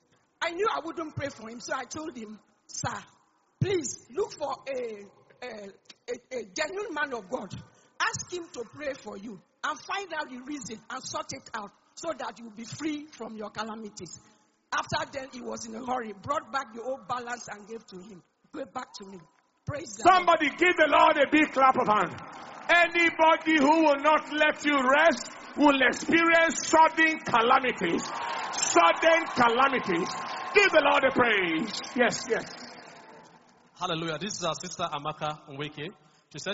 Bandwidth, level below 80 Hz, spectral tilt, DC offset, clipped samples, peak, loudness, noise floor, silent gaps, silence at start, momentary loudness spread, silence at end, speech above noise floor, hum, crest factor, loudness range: 8 kHz; -64 dBFS; -2 dB/octave; under 0.1%; under 0.1%; -6 dBFS; -26 LUFS; -58 dBFS; none; 0.4 s; 20 LU; 0 s; 31 dB; none; 20 dB; 14 LU